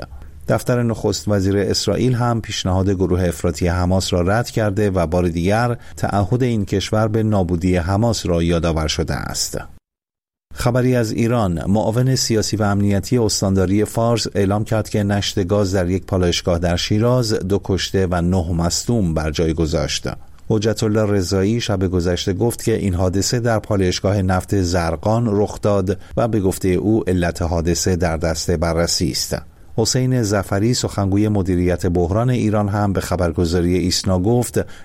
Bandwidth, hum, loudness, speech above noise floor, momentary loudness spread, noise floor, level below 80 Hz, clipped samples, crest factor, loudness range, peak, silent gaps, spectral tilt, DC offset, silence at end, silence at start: 16 kHz; none; -18 LUFS; 71 dB; 3 LU; -89 dBFS; -34 dBFS; under 0.1%; 14 dB; 2 LU; -4 dBFS; none; -5.5 dB/octave; under 0.1%; 0 s; 0 s